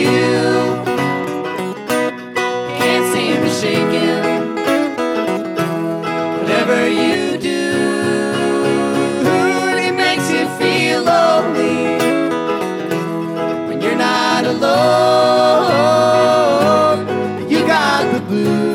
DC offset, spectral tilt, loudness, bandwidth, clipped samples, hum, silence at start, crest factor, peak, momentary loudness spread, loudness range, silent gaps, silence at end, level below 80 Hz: under 0.1%; -5 dB/octave; -15 LUFS; 18 kHz; under 0.1%; none; 0 s; 12 dB; -2 dBFS; 8 LU; 4 LU; none; 0 s; -60 dBFS